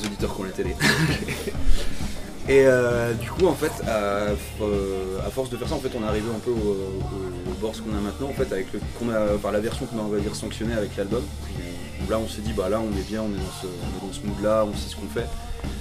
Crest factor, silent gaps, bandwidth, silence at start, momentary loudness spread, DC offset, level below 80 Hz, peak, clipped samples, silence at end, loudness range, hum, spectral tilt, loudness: 20 dB; none; 16 kHz; 0 s; 11 LU; under 0.1%; -34 dBFS; -4 dBFS; under 0.1%; 0 s; 5 LU; none; -5.5 dB/octave; -26 LUFS